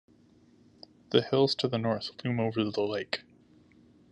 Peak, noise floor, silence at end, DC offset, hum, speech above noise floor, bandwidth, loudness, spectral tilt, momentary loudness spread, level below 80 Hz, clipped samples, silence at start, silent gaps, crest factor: -10 dBFS; -61 dBFS; 0.9 s; under 0.1%; none; 32 dB; 10.5 kHz; -30 LUFS; -6.5 dB/octave; 8 LU; -72 dBFS; under 0.1%; 1.1 s; none; 22 dB